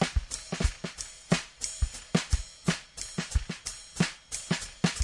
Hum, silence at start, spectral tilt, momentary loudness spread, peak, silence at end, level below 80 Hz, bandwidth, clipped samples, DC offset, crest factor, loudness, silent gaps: none; 0 s; -4 dB/octave; 8 LU; -8 dBFS; 0 s; -36 dBFS; 11.5 kHz; under 0.1%; under 0.1%; 22 dB; -32 LUFS; none